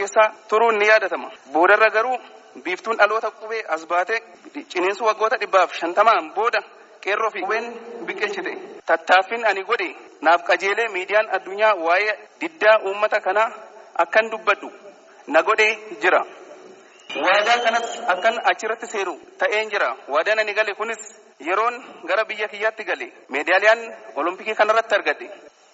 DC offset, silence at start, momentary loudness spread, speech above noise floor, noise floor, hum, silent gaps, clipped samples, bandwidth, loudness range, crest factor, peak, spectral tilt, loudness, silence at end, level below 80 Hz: under 0.1%; 0 s; 13 LU; 25 dB; -46 dBFS; none; none; under 0.1%; 8 kHz; 3 LU; 20 dB; -2 dBFS; 1.5 dB/octave; -20 LUFS; 0.35 s; -82 dBFS